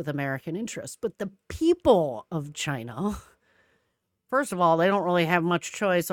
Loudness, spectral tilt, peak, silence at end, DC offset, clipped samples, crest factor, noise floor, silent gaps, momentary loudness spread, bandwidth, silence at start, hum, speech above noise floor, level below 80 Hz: -26 LUFS; -5.5 dB/octave; -6 dBFS; 0 s; under 0.1%; under 0.1%; 20 dB; -76 dBFS; none; 13 LU; 18 kHz; 0 s; none; 51 dB; -56 dBFS